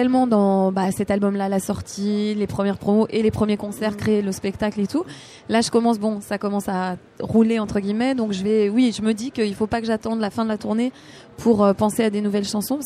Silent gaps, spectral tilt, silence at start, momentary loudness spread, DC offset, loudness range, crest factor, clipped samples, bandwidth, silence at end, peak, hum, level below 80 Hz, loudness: none; -6 dB/octave; 0 s; 7 LU; under 0.1%; 2 LU; 16 dB; under 0.1%; 14.5 kHz; 0 s; -4 dBFS; none; -50 dBFS; -21 LUFS